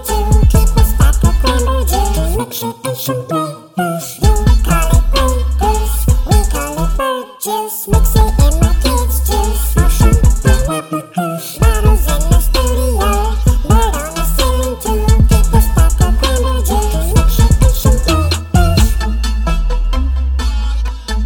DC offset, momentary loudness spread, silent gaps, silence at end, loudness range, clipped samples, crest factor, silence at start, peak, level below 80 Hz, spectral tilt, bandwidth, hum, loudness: under 0.1%; 8 LU; none; 0 s; 3 LU; under 0.1%; 12 dB; 0 s; 0 dBFS; -12 dBFS; -5 dB/octave; 18 kHz; none; -14 LUFS